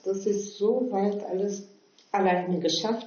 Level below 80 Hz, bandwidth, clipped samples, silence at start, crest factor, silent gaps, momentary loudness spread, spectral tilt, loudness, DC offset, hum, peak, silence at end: -80 dBFS; 7 kHz; under 0.1%; 0.05 s; 16 dB; none; 6 LU; -4 dB/octave; -27 LUFS; under 0.1%; none; -12 dBFS; 0 s